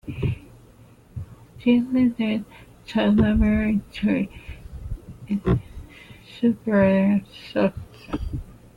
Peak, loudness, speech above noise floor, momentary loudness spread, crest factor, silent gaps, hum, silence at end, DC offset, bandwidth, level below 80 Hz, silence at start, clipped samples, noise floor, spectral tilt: -8 dBFS; -23 LUFS; 29 dB; 22 LU; 16 dB; none; none; 0.25 s; under 0.1%; 9.6 kHz; -36 dBFS; 0.05 s; under 0.1%; -50 dBFS; -8.5 dB/octave